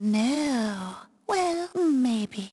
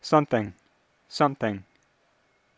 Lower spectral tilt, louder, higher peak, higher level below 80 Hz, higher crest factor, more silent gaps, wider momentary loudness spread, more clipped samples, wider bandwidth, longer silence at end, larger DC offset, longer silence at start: second, -5 dB/octave vs -6.5 dB/octave; about the same, -26 LUFS vs -27 LUFS; second, -12 dBFS vs -6 dBFS; about the same, -66 dBFS vs -62 dBFS; second, 14 dB vs 22 dB; neither; second, 12 LU vs 16 LU; neither; first, 12 kHz vs 8 kHz; second, 0.05 s vs 0.95 s; neither; about the same, 0 s vs 0.05 s